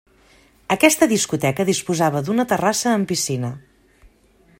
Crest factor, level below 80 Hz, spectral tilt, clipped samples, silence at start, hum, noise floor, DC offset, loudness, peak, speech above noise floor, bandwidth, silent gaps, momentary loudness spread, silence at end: 20 dB; -56 dBFS; -4 dB/octave; under 0.1%; 0.7 s; none; -55 dBFS; under 0.1%; -19 LUFS; 0 dBFS; 36 dB; 16.5 kHz; none; 9 LU; 1 s